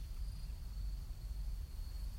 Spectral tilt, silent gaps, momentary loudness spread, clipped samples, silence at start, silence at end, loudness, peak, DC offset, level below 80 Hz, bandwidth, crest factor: -5.5 dB/octave; none; 2 LU; under 0.1%; 0 s; 0 s; -48 LUFS; -32 dBFS; under 0.1%; -44 dBFS; 16 kHz; 10 dB